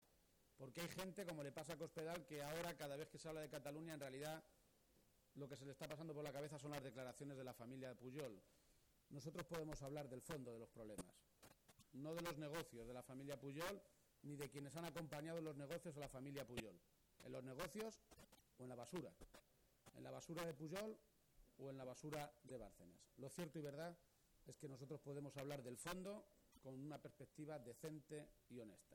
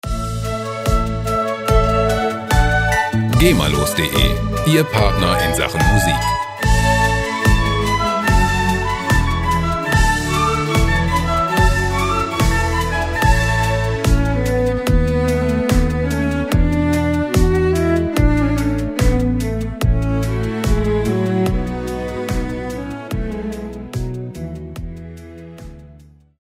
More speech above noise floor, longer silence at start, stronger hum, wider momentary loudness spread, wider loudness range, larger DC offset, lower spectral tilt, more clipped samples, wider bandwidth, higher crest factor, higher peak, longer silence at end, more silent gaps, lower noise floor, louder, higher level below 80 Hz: second, 25 dB vs 29 dB; about the same, 0 s vs 0.05 s; neither; about the same, 11 LU vs 10 LU; second, 3 LU vs 7 LU; neither; about the same, -5 dB/octave vs -5.5 dB/octave; neither; first, 19.5 kHz vs 16 kHz; about the same, 18 dB vs 16 dB; second, -36 dBFS vs 0 dBFS; second, 0 s vs 0.5 s; neither; first, -79 dBFS vs -44 dBFS; second, -54 LUFS vs -17 LUFS; second, -76 dBFS vs -22 dBFS